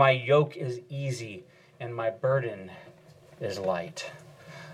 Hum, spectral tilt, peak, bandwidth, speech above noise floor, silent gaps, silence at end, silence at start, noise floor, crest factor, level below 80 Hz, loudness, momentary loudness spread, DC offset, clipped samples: none; -6 dB/octave; -8 dBFS; 13 kHz; 26 dB; none; 0 s; 0 s; -54 dBFS; 22 dB; -74 dBFS; -29 LUFS; 22 LU; under 0.1%; under 0.1%